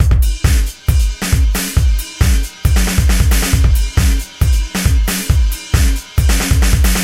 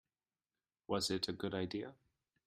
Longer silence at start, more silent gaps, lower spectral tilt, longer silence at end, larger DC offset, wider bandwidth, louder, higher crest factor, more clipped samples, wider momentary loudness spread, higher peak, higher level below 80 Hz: second, 0 s vs 0.9 s; neither; about the same, -4.5 dB/octave vs -4 dB/octave; second, 0 s vs 0.5 s; neither; about the same, 16.5 kHz vs 15.5 kHz; first, -15 LUFS vs -40 LUFS; second, 12 dB vs 22 dB; neither; second, 3 LU vs 8 LU; first, 0 dBFS vs -22 dBFS; first, -14 dBFS vs -72 dBFS